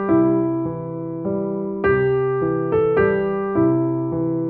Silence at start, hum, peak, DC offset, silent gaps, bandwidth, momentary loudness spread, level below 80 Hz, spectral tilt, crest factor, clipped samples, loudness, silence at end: 0 s; none; -6 dBFS; under 0.1%; none; 3.8 kHz; 8 LU; -46 dBFS; -12 dB/octave; 14 dB; under 0.1%; -20 LUFS; 0 s